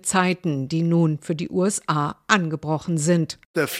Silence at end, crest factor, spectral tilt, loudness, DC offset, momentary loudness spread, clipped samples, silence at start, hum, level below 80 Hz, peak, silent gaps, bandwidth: 0 s; 20 dB; -5 dB/octave; -22 LUFS; under 0.1%; 5 LU; under 0.1%; 0.05 s; none; -62 dBFS; -2 dBFS; 3.45-3.54 s; 16 kHz